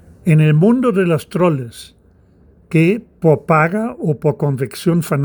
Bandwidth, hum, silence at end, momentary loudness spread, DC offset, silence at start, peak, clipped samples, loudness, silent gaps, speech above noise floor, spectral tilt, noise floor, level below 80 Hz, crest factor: over 20 kHz; none; 0 s; 7 LU; under 0.1%; 0.25 s; 0 dBFS; under 0.1%; -15 LUFS; none; 35 dB; -8 dB/octave; -49 dBFS; -52 dBFS; 16 dB